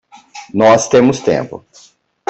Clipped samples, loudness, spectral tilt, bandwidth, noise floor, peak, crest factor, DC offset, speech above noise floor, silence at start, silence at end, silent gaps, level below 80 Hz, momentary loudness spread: under 0.1%; -12 LUFS; -5 dB/octave; 8.4 kHz; -36 dBFS; -2 dBFS; 14 dB; under 0.1%; 25 dB; 0.35 s; 0.7 s; none; -52 dBFS; 18 LU